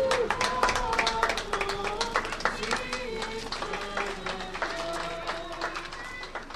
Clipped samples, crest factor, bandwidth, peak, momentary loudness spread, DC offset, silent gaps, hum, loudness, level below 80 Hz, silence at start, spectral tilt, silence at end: under 0.1%; 22 dB; 13 kHz; -8 dBFS; 9 LU; under 0.1%; none; none; -30 LUFS; -44 dBFS; 0 s; -2.5 dB/octave; 0 s